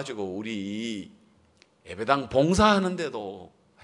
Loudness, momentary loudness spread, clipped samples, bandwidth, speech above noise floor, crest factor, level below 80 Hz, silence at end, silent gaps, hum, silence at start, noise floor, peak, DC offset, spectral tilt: -26 LUFS; 20 LU; under 0.1%; 11 kHz; 35 dB; 24 dB; -48 dBFS; 0.35 s; none; none; 0 s; -61 dBFS; -4 dBFS; under 0.1%; -5 dB/octave